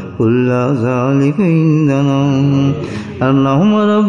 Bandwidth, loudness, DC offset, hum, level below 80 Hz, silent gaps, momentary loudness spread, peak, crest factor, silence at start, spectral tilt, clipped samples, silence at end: 7.4 kHz; -13 LUFS; under 0.1%; none; -52 dBFS; none; 4 LU; -2 dBFS; 10 dB; 0 s; -8.5 dB/octave; under 0.1%; 0 s